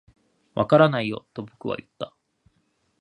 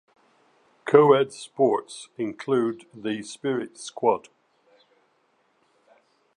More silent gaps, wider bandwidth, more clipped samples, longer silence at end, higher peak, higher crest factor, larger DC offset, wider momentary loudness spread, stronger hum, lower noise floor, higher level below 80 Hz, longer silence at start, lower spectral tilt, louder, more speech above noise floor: neither; second, 9.8 kHz vs 11 kHz; neither; second, 0.95 s vs 2.2 s; about the same, -2 dBFS vs -2 dBFS; about the same, 22 dB vs 24 dB; neither; first, 20 LU vs 15 LU; neither; about the same, -69 dBFS vs -67 dBFS; first, -62 dBFS vs -76 dBFS; second, 0.55 s vs 0.85 s; first, -8 dB/octave vs -5.5 dB/octave; about the same, -23 LUFS vs -24 LUFS; about the same, 47 dB vs 44 dB